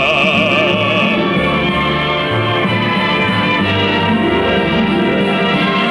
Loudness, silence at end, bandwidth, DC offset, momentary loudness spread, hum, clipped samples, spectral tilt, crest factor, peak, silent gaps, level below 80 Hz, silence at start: -13 LUFS; 0 s; 12 kHz; under 0.1%; 3 LU; none; under 0.1%; -6 dB/octave; 12 dB; -2 dBFS; none; -38 dBFS; 0 s